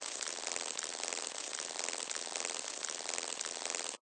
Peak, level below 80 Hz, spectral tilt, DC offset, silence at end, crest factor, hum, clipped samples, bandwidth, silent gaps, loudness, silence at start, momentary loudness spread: -16 dBFS; -84 dBFS; 2 dB/octave; under 0.1%; 0.05 s; 24 dB; none; under 0.1%; 10 kHz; none; -38 LUFS; 0 s; 1 LU